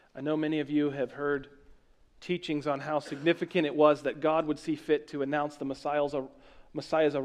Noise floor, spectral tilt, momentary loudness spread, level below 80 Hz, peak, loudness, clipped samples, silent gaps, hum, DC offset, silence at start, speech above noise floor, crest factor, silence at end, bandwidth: -60 dBFS; -6.5 dB/octave; 11 LU; -64 dBFS; -10 dBFS; -30 LUFS; under 0.1%; none; none; under 0.1%; 0.15 s; 30 dB; 20 dB; 0 s; 10.5 kHz